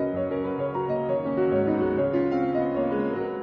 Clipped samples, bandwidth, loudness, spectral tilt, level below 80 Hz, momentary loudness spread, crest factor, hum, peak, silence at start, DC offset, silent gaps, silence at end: under 0.1%; 5.4 kHz; -26 LUFS; -10 dB/octave; -54 dBFS; 4 LU; 12 dB; none; -12 dBFS; 0 s; under 0.1%; none; 0 s